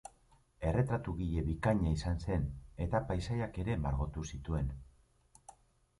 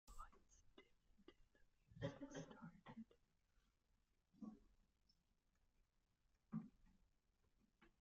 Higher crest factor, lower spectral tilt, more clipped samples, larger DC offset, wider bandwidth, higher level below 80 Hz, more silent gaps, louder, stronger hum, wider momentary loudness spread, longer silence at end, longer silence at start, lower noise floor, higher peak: second, 20 dB vs 26 dB; about the same, -7.5 dB/octave vs -6.5 dB/octave; neither; neither; first, 11.5 kHz vs 7.4 kHz; first, -44 dBFS vs -74 dBFS; neither; first, -36 LUFS vs -58 LUFS; neither; about the same, 9 LU vs 11 LU; first, 0.5 s vs 0.1 s; about the same, 0.05 s vs 0.05 s; second, -67 dBFS vs -85 dBFS; first, -16 dBFS vs -36 dBFS